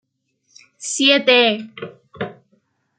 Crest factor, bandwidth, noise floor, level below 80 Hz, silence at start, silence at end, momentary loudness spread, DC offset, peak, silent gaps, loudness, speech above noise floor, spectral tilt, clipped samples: 20 dB; 9.4 kHz; -67 dBFS; -70 dBFS; 0.8 s; 0.65 s; 22 LU; under 0.1%; -2 dBFS; none; -15 LUFS; 50 dB; -2 dB/octave; under 0.1%